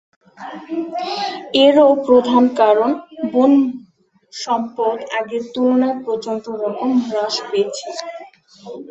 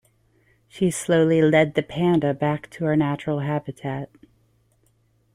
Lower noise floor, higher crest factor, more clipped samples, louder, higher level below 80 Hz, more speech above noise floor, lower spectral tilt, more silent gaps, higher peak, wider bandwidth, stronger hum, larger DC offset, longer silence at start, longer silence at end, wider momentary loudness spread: second, -52 dBFS vs -64 dBFS; about the same, 16 dB vs 18 dB; neither; first, -17 LUFS vs -22 LUFS; second, -64 dBFS vs -58 dBFS; second, 35 dB vs 42 dB; second, -4 dB/octave vs -6.5 dB/octave; neither; first, -2 dBFS vs -6 dBFS; second, 8.2 kHz vs 15.5 kHz; neither; neither; second, 0.4 s vs 0.75 s; second, 0.05 s vs 1.3 s; first, 20 LU vs 13 LU